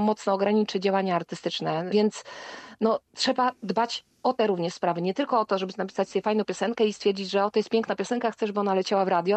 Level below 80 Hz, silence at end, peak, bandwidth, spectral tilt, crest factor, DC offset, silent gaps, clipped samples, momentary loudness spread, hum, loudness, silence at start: -74 dBFS; 0 s; -12 dBFS; 9 kHz; -5 dB/octave; 14 dB; under 0.1%; none; under 0.1%; 5 LU; none; -26 LUFS; 0 s